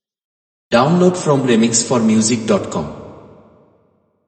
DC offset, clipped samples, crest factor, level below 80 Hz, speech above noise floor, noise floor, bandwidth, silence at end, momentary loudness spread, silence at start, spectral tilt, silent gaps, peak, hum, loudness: under 0.1%; under 0.1%; 16 dB; -52 dBFS; 45 dB; -59 dBFS; 8.8 kHz; 1.1 s; 11 LU; 0.7 s; -5 dB/octave; none; 0 dBFS; none; -15 LUFS